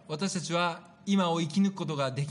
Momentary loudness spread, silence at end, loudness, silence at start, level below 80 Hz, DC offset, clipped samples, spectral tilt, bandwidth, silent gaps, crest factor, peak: 5 LU; 0 s; -29 LUFS; 0.1 s; -76 dBFS; under 0.1%; under 0.1%; -5.5 dB/octave; 10.5 kHz; none; 14 dB; -16 dBFS